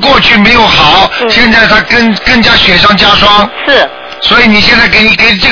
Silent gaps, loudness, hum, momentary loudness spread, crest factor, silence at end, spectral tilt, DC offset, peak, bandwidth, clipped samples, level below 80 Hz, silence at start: none; -3 LUFS; none; 4 LU; 6 dB; 0 s; -4 dB/octave; 2%; 0 dBFS; 5.4 kHz; 10%; -24 dBFS; 0 s